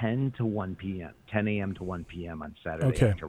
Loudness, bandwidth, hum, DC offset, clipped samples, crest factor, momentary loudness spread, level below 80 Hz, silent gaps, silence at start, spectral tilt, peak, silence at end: -31 LUFS; 12.5 kHz; none; under 0.1%; under 0.1%; 22 dB; 12 LU; -48 dBFS; none; 0 s; -8 dB/octave; -8 dBFS; 0 s